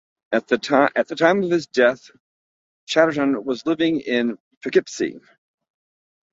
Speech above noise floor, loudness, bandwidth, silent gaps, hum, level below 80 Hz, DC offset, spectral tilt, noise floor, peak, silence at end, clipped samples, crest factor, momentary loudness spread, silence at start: over 70 dB; -20 LUFS; 7.8 kHz; 2.20-2.87 s, 4.40-4.51 s, 4.57-4.61 s; none; -66 dBFS; under 0.1%; -5 dB/octave; under -90 dBFS; -2 dBFS; 1.15 s; under 0.1%; 20 dB; 9 LU; 0.3 s